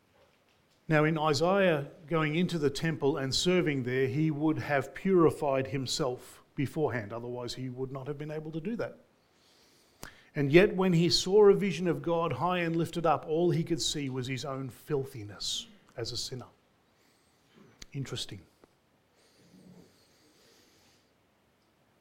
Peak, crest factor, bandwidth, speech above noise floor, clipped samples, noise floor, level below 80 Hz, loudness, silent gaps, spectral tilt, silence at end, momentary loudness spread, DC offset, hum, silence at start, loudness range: -6 dBFS; 24 dB; 16.5 kHz; 40 dB; under 0.1%; -69 dBFS; -58 dBFS; -30 LUFS; none; -5.5 dB/octave; 3.6 s; 15 LU; under 0.1%; none; 0.9 s; 19 LU